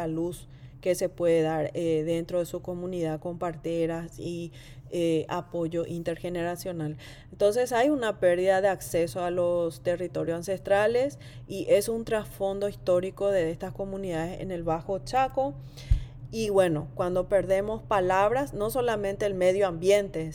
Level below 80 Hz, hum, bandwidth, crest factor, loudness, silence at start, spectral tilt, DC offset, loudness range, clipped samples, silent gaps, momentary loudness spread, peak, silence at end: -44 dBFS; none; 17.5 kHz; 18 dB; -28 LUFS; 0 s; -6 dB/octave; under 0.1%; 5 LU; under 0.1%; none; 11 LU; -10 dBFS; 0 s